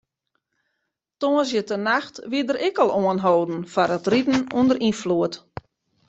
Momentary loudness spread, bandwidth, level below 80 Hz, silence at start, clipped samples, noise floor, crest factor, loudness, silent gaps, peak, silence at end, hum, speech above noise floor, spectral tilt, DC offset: 7 LU; 8.2 kHz; -60 dBFS; 1.2 s; under 0.1%; -78 dBFS; 18 dB; -22 LUFS; none; -4 dBFS; 0.7 s; none; 57 dB; -5.5 dB/octave; under 0.1%